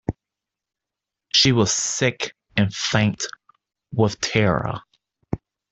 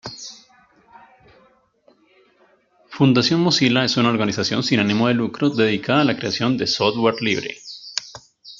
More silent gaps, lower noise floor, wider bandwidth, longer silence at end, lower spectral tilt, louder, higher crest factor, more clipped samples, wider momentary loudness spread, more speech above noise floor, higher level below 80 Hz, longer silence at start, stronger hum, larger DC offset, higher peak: neither; first, -86 dBFS vs -58 dBFS; first, 8.4 kHz vs 7.6 kHz; first, 0.35 s vs 0.05 s; about the same, -4 dB/octave vs -5 dB/octave; about the same, -21 LUFS vs -19 LUFS; about the same, 20 dB vs 18 dB; neither; about the same, 16 LU vs 18 LU; first, 65 dB vs 40 dB; first, -50 dBFS vs -60 dBFS; about the same, 0.1 s vs 0.05 s; neither; neither; about the same, -4 dBFS vs -2 dBFS